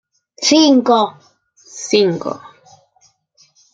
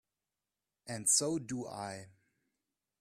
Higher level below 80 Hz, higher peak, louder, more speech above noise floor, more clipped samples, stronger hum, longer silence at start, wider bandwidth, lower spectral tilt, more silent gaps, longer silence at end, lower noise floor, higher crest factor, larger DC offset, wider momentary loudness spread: first, -64 dBFS vs -76 dBFS; first, 0 dBFS vs -16 dBFS; first, -14 LUFS vs -33 LUFS; second, 43 dB vs over 55 dB; neither; neither; second, 0.4 s vs 0.85 s; second, 9.2 kHz vs 15.5 kHz; about the same, -3.5 dB/octave vs -2.5 dB/octave; neither; first, 1.35 s vs 0.9 s; second, -57 dBFS vs under -90 dBFS; second, 16 dB vs 24 dB; neither; first, 19 LU vs 16 LU